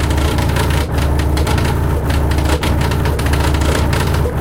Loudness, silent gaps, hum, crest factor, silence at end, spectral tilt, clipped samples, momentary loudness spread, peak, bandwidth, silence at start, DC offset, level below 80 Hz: -16 LUFS; none; none; 12 dB; 0 s; -5.5 dB/octave; under 0.1%; 1 LU; -2 dBFS; 16.5 kHz; 0 s; under 0.1%; -18 dBFS